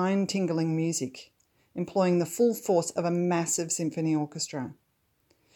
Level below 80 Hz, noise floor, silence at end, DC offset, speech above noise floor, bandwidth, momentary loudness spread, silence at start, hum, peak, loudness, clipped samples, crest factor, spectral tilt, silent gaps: -74 dBFS; -72 dBFS; 0.8 s; under 0.1%; 45 dB; 19 kHz; 12 LU; 0 s; none; -12 dBFS; -28 LUFS; under 0.1%; 16 dB; -5 dB/octave; none